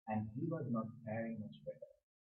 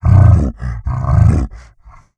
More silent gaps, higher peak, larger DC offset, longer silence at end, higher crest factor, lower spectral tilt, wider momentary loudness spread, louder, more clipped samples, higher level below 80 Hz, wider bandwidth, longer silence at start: neither; second, -30 dBFS vs 0 dBFS; neither; second, 0.4 s vs 0.6 s; about the same, 14 dB vs 12 dB; about the same, -8.5 dB/octave vs -9.5 dB/octave; about the same, 12 LU vs 14 LU; second, -44 LUFS vs -13 LUFS; neither; second, -78 dBFS vs -20 dBFS; second, 4 kHz vs 8.4 kHz; about the same, 0.05 s vs 0.05 s